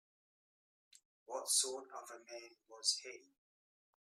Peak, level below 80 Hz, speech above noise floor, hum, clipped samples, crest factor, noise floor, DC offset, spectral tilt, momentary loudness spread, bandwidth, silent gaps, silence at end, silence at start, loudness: -20 dBFS; under -90 dBFS; over 48 dB; none; under 0.1%; 26 dB; under -90 dBFS; under 0.1%; 2.5 dB/octave; 20 LU; 15.5 kHz; none; 0.85 s; 1.3 s; -37 LUFS